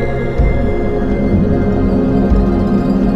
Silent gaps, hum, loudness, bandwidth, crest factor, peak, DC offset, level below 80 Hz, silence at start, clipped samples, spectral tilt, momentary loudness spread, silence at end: none; none; -14 LUFS; 6.6 kHz; 12 dB; -2 dBFS; under 0.1%; -18 dBFS; 0 s; under 0.1%; -10 dB/octave; 4 LU; 0 s